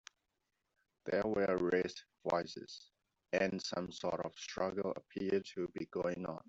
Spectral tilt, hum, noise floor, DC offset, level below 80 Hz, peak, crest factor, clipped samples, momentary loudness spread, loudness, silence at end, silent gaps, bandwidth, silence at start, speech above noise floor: -5 dB/octave; none; -86 dBFS; under 0.1%; -72 dBFS; -18 dBFS; 20 dB; under 0.1%; 11 LU; -38 LUFS; 0.1 s; none; 8 kHz; 1.05 s; 48 dB